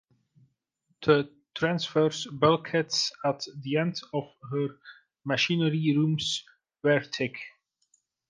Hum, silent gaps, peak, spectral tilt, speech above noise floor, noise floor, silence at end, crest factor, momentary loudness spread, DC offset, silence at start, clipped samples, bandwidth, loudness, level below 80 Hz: none; none; -8 dBFS; -5 dB/octave; 48 dB; -75 dBFS; 0.8 s; 22 dB; 10 LU; under 0.1%; 1 s; under 0.1%; 9.8 kHz; -28 LUFS; -68 dBFS